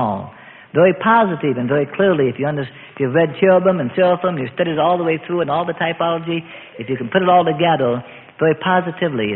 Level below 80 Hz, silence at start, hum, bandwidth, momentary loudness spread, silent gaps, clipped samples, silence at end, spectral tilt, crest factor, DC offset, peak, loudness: -58 dBFS; 0 s; none; 4.2 kHz; 12 LU; none; under 0.1%; 0 s; -11.5 dB/octave; 16 dB; under 0.1%; 0 dBFS; -17 LUFS